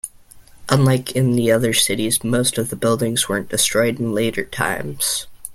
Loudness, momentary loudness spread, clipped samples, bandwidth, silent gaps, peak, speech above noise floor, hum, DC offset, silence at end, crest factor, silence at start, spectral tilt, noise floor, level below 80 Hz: -18 LUFS; 6 LU; under 0.1%; 16.5 kHz; none; 0 dBFS; 26 dB; none; under 0.1%; 0 s; 18 dB; 0.05 s; -4 dB/octave; -45 dBFS; -48 dBFS